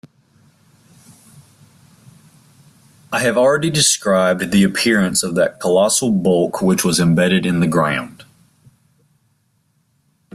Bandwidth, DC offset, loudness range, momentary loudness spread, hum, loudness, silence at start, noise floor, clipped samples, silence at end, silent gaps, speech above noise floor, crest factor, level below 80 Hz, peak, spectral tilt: 15 kHz; under 0.1%; 7 LU; 5 LU; none; -15 LUFS; 3.1 s; -63 dBFS; under 0.1%; 2.15 s; none; 47 dB; 16 dB; -54 dBFS; -2 dBFS; -4 dB/octave